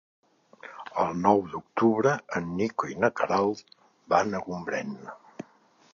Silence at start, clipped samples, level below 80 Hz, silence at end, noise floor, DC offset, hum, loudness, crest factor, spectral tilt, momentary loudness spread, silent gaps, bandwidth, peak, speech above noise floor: 0.65 s; under 0.1%; -64 dBFS; 0.5 s; -61 dBFS; under 0.1%; none; -27 LUFS; 22 dB; -6 dB/octave; 21 LU; none; 7.2 kHz; -6 dBFS; 34 dB